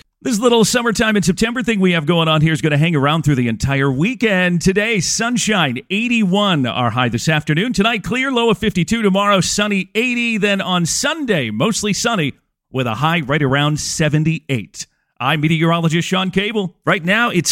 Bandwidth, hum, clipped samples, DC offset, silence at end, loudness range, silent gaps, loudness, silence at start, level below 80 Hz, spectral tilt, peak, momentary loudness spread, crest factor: 16.5 kHz; none; under 0.1%; under 0.1%; 0 s; 2 LU; none; -16 LUFS; 0.25 s; -44 dBFS; -4.5 dB/octave; -2 dBFS; 4 LU; 16 dB